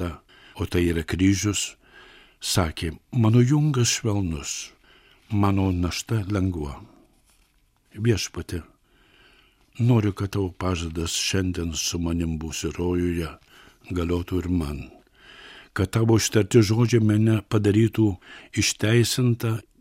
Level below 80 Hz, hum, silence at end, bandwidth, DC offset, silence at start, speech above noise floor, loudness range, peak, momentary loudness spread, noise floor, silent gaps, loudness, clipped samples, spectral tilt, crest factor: -44 dBFS; none; 0.2 s; 16 kHz; under 0.1%; 0 s; 41 dB; 8 LU; -6 dBFS; 13 LU; -63 dBFS; none; -24 LUFS; under 0.1%; -5.5 dB/octave; 18 dB